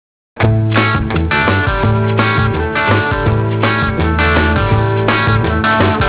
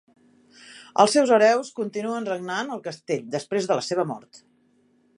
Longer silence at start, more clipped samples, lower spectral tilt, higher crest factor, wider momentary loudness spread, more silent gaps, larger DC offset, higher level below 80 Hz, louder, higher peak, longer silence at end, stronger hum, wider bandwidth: second, 0.35 s vs 0.7 s; neither; first, -10.5 dB/octave vs -4 dB/octave; second, 12 dB vs 22 dB; second, 3 LU vs 14 LU; neither; first, 0.3% vs under 0.1%; first, -24 dBFS vs -78 dBFS; first, -13 LUFS vs -23 LUFS; about the same, 0 dBFS vs -2 dBFS; second, 0 s vs 0.8 s; neither; second, 4 kHz vs 11.5 kHz